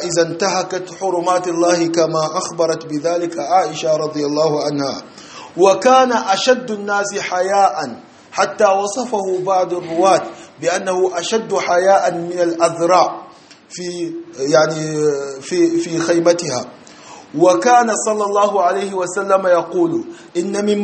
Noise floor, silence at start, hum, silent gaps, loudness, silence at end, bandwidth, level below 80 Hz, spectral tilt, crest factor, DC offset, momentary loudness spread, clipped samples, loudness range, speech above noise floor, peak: -41 dBFS; 0 s; none; none; -16 LUFS; 0 s; 8.8 kHz; -64 dBFS; -4 dB/octave; 16 dB; under 0.1%; 11 LU; under 0.1%; 2 LU; 26 dB; 0 dBFS